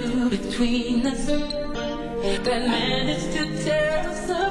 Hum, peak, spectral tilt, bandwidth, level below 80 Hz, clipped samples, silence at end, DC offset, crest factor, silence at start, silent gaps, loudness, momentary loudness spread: none; -10 dBFS; -4.5 dB/octave; 11.5 kHz; -38 dBFS; under 0.1%; 0 s; under 0.1%; 14 dB; 0 s; none; -24 LUFS; 6 LU